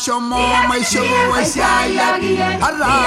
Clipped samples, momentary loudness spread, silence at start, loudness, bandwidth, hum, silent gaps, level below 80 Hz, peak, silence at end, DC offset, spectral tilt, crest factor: under 0.1%; 3 LU; 0 s; -15 LUFS; 16 kHz; none; none; -36 dBFS; -4 dBFS; 0 s; under 0.1%; -3 dB/octave; 12 dB